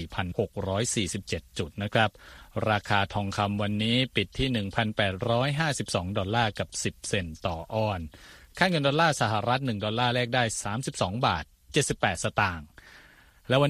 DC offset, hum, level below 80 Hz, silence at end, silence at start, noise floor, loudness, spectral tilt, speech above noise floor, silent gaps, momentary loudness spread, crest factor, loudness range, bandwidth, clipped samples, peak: under 0.1%; none; -50 dBFS; 0 s; 0 s; -55 dBFS; -28 LUFS; -4.5 dB/octave; 28 dB; none; 8 LU; 22 dB; 2 LU; 14.5 kHz; under 0.1%; -6 dBFS